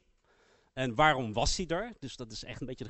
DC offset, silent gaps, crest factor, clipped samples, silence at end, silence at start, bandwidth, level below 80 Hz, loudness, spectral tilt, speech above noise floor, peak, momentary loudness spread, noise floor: under 0.1%; none; 22 dB; under 0.1%; 0 s; 0.75 s; 8.2 kHz; -46 dBFS; -31 LUFS; -4 dB/octave; 36 dB; -10 dBFS; 16 LU; -68 dBFS